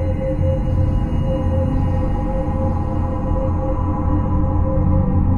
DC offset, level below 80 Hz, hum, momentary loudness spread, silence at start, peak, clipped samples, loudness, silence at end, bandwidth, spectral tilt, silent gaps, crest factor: under 0.1%; -24 dBFS; none; 4 LU; 0 s; -6 dBFS; under 0.1%; -20 LUFS; 0 s; 3 kHz; -10.5 dB/octave; none; 12 dB